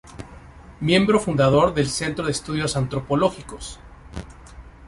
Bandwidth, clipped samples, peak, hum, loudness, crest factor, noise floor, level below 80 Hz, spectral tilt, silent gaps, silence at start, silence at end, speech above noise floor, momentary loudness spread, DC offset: 11.5 kHz; under 0.1%; -4 dBFS; none; -21 LUFS; 18 dB; -43 dBFS; -42 dBFS; -5.5 dB/octave; none; 0.05 s; 0 s; 22 dB; 21 LU; under 0.1%